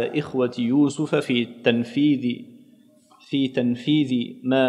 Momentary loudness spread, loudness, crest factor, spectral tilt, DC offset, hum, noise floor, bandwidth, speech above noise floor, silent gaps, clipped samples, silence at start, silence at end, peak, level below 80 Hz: 5 LU; -23 LUFS; 18 dB; -6.5 dB/octave; under 0.1%; none; -54 dBFS; 11 kHz; 32 dB; none; under 0.1%; 0 s; 0 s; -4 dBFS; -70 dBFS